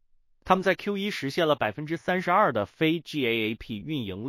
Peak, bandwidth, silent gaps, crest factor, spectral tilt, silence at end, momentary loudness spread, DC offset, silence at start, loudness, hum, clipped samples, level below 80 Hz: -6 dBFS; 16 kHz; none; 22 dB; -6 dB/octave; 0 s; 9 LU; under 0.1%; 0.45 s; -26 LUFS; none; under 0.1%; -58 dBFS